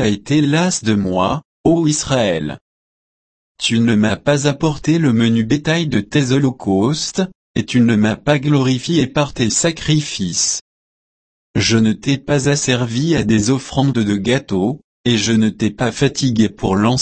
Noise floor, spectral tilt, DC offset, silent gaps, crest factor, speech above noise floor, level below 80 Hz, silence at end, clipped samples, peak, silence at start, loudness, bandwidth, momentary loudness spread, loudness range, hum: under -90 dBFS; -5 dB/octave; under 0.1%; 1.45-1.64 s, 2.61-3.55 s, 7.35-7.54 s, 10.61-11.54 s, 14.84-15.04 s; 14 dB; over 75 dB; -42 dBFS; 0 s; under 0.1%; -2 dBFS; 0 s; -16 LUFS; 8.8 kHz; 5 LU; 2 LU; none